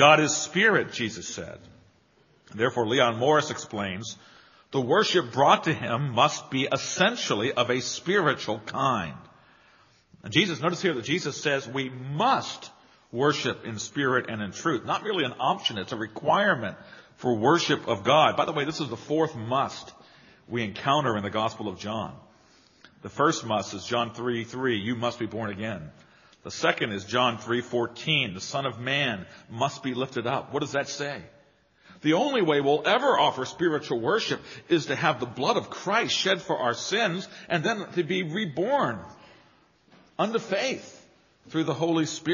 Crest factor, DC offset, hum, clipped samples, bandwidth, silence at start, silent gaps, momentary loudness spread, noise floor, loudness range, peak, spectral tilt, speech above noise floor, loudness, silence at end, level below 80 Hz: 24 dB; under 0.1%; none; under 0.1%; 7.4 kHz; 0 s; none; 12 LU; -62 dBFS; 5 LU; -2 dBFS; -3 dB/octave; 36 dB; -26 LUFS; 0 s; -68 dBFS